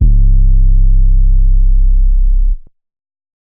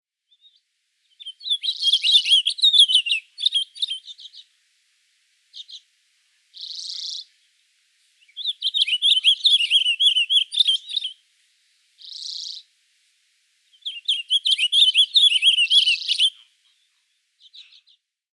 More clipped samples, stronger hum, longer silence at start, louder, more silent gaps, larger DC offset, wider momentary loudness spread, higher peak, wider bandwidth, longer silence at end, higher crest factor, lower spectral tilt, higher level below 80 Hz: neither; neither; second, 0 s vs 1.2 s; about the same, -14 LUFS vs -16 LUFS; neither; neither; second, 5 LU vs 20 LU; about the same, -2 dBFS vs -4 dBFS; second, 0.4 kHz vs 12.5 kHz; first, 0.9 s vs 0.7 s; second, 6 dB vs 20 dB; first, -16 dB/octave vs 12 dB/octave; first, -8 dBFS vs under -90 dBFS